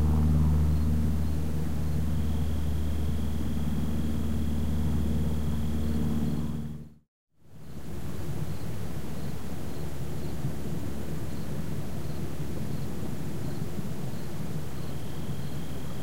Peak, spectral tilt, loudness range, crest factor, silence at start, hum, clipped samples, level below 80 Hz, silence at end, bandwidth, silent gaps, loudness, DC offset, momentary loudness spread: -14 dBFS; -7.5 dB/octave; 7 LU; 18 dB; 0 s; none; under 0.1%; -36 dBFS; 0 s; 16 kHz; 7.08-7.27 s; -32 LUFS; 4%; 10 LU